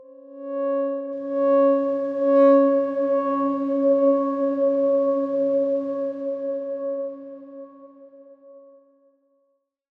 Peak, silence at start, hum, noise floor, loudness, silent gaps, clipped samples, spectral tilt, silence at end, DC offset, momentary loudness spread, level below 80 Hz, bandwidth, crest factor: -6 dBFS; 0.25 s; none; -71 dBFS; -22 LUFS; none; under 0.1%; -8 dB/octave; 1.4 s; under 0.1%; 14 LU; -78 dBFS; 4.1 kHz; 16 dB